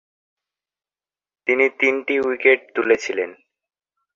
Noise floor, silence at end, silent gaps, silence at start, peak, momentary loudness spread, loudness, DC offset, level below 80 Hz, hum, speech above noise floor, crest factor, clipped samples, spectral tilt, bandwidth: under -90 dBFS; 0.8 s; none; 1.45 s; -2 dBFS; 10 LU; -19 LUFS; under 0.1%; -68 dBFS; none; over 71 dB; 20 dB; under 0.1%; -3.5 dB/octave; 7.6 kHz